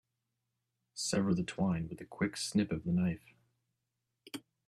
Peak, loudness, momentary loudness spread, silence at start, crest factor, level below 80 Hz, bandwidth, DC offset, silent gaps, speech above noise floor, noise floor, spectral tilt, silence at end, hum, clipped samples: -18 dBFS; -35 LUFS; 16 LU; 0.95 s; 18 dB; -64 dBFS; 13.5 kHz; under 0.1%; none; 52 dB; -86 dBFS; -5.5 dB/octave; 0.3 s; none; under 0.1%